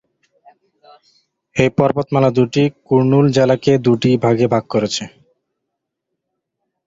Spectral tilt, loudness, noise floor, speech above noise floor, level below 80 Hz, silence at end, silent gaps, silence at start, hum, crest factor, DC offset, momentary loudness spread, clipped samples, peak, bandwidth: -6.5 dB/octave; -15 LUFS; -77 dBFS; 63 dB; -52 dBFS; 1.8 s; none; 1.55 s; none; 16 dB; under 0.1%; 6 LU; under 0.1%; 0 dBFS; 8 kHz